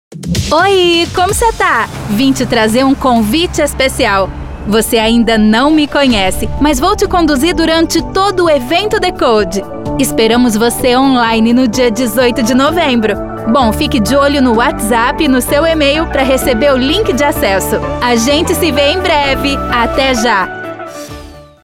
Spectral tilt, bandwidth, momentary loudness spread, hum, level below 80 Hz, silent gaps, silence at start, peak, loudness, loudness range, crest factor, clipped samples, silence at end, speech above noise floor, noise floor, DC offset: -4 dB/octave; 17.5 kHz; 5 LU; none; -28 dBFS; none; 0.1 s; 0 dBFS; -11 LUFS; 1 LU; 10 dB; under 0.1%; 0.2 s; 21 dB; -31 dBFS; under 0.1%